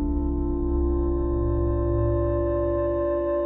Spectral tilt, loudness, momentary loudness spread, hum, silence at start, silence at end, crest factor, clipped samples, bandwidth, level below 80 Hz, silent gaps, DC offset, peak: -13 dB/octave; -25 LUFS; 3 LU; none; 0 s; 0 s; 10 dB; under 0.1%; 2.8 kHz; -28 dBFS; none; under 0.1%; -12 dBFS